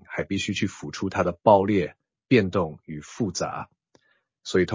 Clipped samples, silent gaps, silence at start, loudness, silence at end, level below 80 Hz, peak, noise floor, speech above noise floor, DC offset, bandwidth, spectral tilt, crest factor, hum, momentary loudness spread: under 0.1%; none; 0.1 s; -24 LUFS; 0 s; -50 dBFS; -2 dBFS; -64 dBFS; 40 dB; under 0.1%; 7.6 kHz; -5.5 dB/octave; 22 dB; none; 18 LU